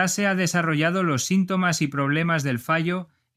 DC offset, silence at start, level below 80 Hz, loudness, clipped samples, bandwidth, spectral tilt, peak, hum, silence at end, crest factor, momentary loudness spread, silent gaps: under 0.1%; 0 s; -64 dBFS; -23 LUFS; under 0.1%; 15.5 kHz; -4.5 dB/octave; -6 dBFS; none; 0.3 s; 16 dB; 2 LU; none